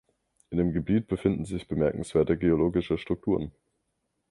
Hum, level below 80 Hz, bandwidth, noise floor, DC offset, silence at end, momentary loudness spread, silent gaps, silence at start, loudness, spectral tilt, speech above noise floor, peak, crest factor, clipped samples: none; -46 dBFS; 11.5 kHz; -78 dBFS; under 0.1%; 0.8 s; 8 LU; none; 0.5 s; -27 LUFS; -8 dB/octave; 52 dB; -10 dBFS; 18 dB; under 0.1%